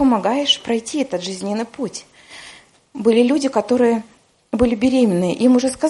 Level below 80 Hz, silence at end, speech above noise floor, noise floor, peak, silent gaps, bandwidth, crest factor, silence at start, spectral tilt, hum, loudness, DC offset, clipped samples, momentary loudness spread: -48 dBFS; 0 s; 27 dB; -44 dBFS; -2 dBFS; none; 11.5 kHz; 16 dB; 0 s; -4.5 dB/octave; none; -18 LUFS; under 0.1%; under 0.1%; 13 LU